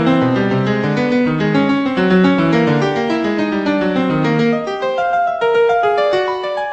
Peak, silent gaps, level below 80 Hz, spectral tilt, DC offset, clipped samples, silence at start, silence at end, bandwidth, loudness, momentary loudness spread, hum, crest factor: -2 dBFS; none; -48 dBFS; -7.5 dB/octave; under 0.1%; under 0.1%; 0 s; 0 s; 8.4 kHz; -15 LUFS; 4 LU; none; 12 dB